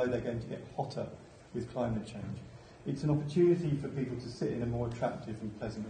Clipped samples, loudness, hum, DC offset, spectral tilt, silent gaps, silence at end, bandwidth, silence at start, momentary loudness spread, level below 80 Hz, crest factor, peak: under 0.1%; -35 LUFS; none; under 0.1%; -8 dB/octave; none; 0 s; 9.6 kHz; 0 s; 16 LU; -56 dBFS; 18 dB; -18 dBFS